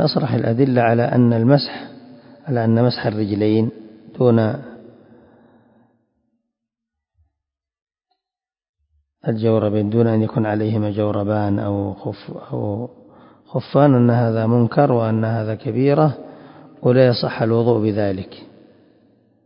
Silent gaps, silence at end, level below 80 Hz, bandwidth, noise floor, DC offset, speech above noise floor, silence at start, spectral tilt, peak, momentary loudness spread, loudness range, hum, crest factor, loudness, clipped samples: 7.82-7.87 s, 8.69-8.74 s; 1 s; -52 dBFS; 5.4 kHz; -90 dBFS; under 0.1%; 73 dB; 0 s; -12.5 dB/octave; 0 dBFS; 14 LU; 7 LU; none; 18 dB; -18 LUFS; under 0.1%